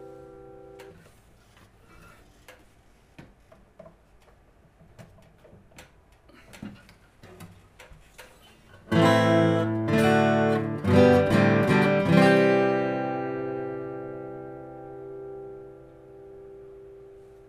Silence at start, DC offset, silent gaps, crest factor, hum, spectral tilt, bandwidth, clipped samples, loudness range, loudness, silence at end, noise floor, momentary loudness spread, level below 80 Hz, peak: 0 s; under 0.1%; none; 22 dB; none; -7 dB/octave; 15.5 kHz; under 0.1%; 18 LU; -22 LUFS; 0.6 s; -58 dBFS; 27 LU; -58 dBFS; -6 dBFS